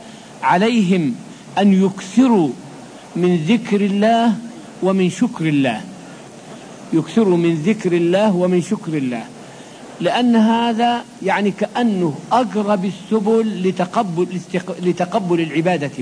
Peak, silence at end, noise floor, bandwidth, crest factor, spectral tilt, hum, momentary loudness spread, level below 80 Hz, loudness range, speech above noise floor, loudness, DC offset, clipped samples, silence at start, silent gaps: -2 dBFS; 0 s; -37 dBFS; 10.5 kHz; 16 dB; -6.5 dB/octave; none; 20 LU; -64 dBFS; 2 LU; 21 dB; -17 LUFS; under 0.1%; under 0.1%; 0 s; none